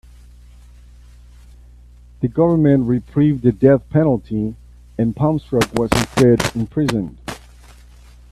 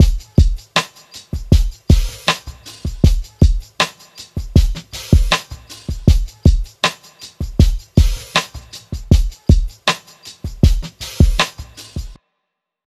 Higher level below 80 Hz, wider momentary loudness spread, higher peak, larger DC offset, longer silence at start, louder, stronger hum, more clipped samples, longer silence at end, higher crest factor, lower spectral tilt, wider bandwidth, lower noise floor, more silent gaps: second, -40 dBFS vs -18 dBFS; second, 12 LU vs 16 LU; about the same, 0 dBFS vs 0 dBFS; neither; first, 2.2 s vs 0 s; about the same, -17 LUFS vs -17 LUFS; first, 60 Hz at -40 dBFS vs none; neither; first, 0.95 s vs 0.75 s; about the same, 18 dB vs 16 dB; first, -7 dB/octave vs -5 dB/octave; about the same, 14.5 kHz vs 13.5 kHz; second, -43 dBFS vs -77 dBFS; neither